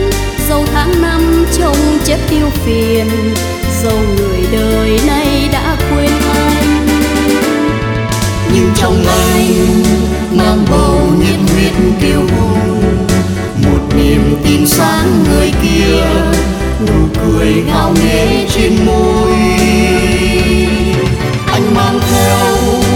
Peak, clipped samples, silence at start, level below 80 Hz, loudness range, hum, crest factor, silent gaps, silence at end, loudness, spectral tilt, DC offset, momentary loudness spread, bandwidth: 0 dBFS; under 0.1%; 0 s; -18 dBFS; 2 LU; none; 10 dB; none; 0 s; -11 LUFS; -5.5 dB/octave; under 0.1%; 4 LU; 20 kHz